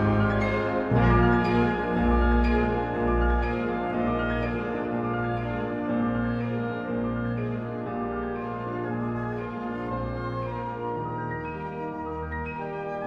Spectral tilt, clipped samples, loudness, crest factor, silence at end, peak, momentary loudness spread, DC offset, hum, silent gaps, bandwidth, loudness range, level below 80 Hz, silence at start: -9 dB/octave; under 0.1%; -27 LUFS; 18 dB; 0 s; -10 dBFS; 10 LU; under 0.1%; none; none; 7 kHz; 8 LU; -34 dBFS; 0 s